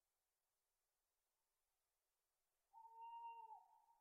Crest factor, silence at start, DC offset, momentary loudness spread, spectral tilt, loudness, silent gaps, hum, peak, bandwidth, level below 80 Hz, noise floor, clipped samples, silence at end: 16 dB; 2.75 s; under 0.1%; 9 LU; 6.5 dB/octave; -60 LUFS; none; none; -50 dBFS; 2.8 kHz; under -90 dBFS; under -90 dBFS; under 0.1%; 0 s